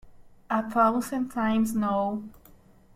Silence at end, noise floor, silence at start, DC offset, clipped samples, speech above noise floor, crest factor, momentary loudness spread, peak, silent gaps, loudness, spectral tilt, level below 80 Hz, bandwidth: 0.65 s; -55 dBFS; 0.05 s; under 0.1%; under 0.1%; 29 dB; 20 dB; 8 LU; -8 dBFS; none; -26 LUFS; -6 dB/octave; -56 dBFS; 15.5 kHz